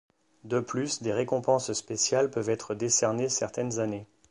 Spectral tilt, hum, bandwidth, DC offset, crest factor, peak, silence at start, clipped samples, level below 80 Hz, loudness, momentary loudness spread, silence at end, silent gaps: -3.5 dB/octave; none; 11.5 kHz; under 0.1%; 18 dB; -12 dBFS; 0.45 s; under 0.1%; -68 dBFS; -28 LUFS; 7 LU; 0.25 s; none